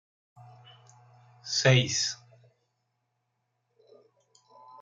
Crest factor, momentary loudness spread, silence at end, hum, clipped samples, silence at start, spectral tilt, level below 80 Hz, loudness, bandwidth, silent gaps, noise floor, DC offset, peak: 26 dB; 22 LU; 2.65 s; none; under 0.1%; 0.4 s; -3.5 dB/octave; -70 dBFS; -25 LUFS; 9.2 kHz; none; -79 dBFS; under 0.1%; -8 dBFS